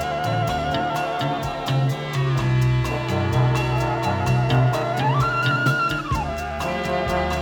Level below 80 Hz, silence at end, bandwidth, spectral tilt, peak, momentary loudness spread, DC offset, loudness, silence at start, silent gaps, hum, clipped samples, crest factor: -38 dBFS; 0 s; 18 kHz; -6.5 dB/octave; -6 dBFS; 5 LU; under 0.1%; -22 LUFS; 0 s; none; none; under 0.1%; 14 dB